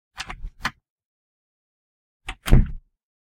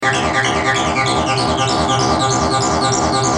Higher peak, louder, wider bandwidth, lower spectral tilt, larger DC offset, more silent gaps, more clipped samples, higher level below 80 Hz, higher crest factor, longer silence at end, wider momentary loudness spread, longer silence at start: about the same, 0 dBFS vs -2 dBFS; second, -26 LUFS vs -15 LUFS; first, 15.5 kHz vs 10.5 kHz; first, -6 dB/octave vs -3.5 dB/octave; neither; first, 0.90-0.96 s, 1.05-2.20 s vs none; neither; first, -26 dBFS vs -38 dBFS; first, 24 dB vs 14 dB; first, 0.45 s vs 0 s; first, 18 LU vs 1 LU; first, 0.2 s vs 0 s